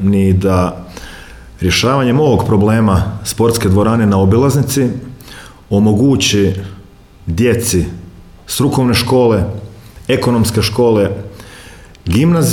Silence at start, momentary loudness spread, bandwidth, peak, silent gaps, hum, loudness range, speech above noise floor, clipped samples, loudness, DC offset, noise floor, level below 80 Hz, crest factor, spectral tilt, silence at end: 0 s; 18 LU; 18.5 kHz; 0 dBFS; none; none; 3 LU; 27 dB; under 0.1%; -13 LUFS; under 0.1%; -38 dBFS; -34 dBFS; 12 dB; -5.5 dB/octave; 0 s